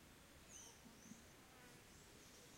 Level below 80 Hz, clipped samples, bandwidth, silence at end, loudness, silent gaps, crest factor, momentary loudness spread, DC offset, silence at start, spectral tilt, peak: -76 dBFS; under 0.1%; 16.5 kHz; 0 s; -62 LUFS; none; 18 dB; 5 LU; under 0.1%; 0 s; -2.5 dB/octave; -44 dBFS